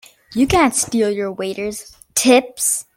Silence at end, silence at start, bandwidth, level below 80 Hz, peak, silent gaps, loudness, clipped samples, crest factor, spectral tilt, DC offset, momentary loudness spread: 0.15 s; 0.3 s; 17 kHz; -44 dBFS; 0 dBFS; none; -17 LUFS; under 0.1%; 18 dB; -3 dB/octave; under 0.1%; 13 LU